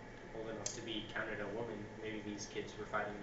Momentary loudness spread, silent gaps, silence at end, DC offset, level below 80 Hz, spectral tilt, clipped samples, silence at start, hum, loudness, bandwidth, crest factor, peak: 5 LU; none; 0 s; under 0.1%; -60 dBFS; -3 dB/octave; under 0.1%; 0 s; none; -44 LUFS; 8 kHz; 22 dB; -22 dBFS